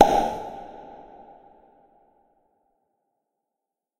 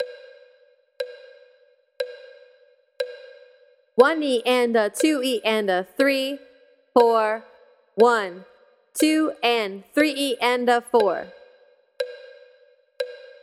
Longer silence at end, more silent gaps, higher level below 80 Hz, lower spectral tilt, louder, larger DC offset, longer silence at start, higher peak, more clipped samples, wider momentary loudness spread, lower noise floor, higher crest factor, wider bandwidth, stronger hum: first, 3.05 s vs 0.15 s; neither; first, -52 dBFS vs -74 dBFS; first, -4.5 dB/octave vs -3 dB/octave; second, -25 LUFS vs -22 LUFS; neither; about the same, 0 s vs 0 s; about the same, 0 dBFS vs -2 dBFS; neither; first, 27 LU vs 16 LU; first, -86 dBFS vs -59 dBFS; first, 28 dB vs 22 dB; about the same, 16 kHz vs 15.5 kHz; neither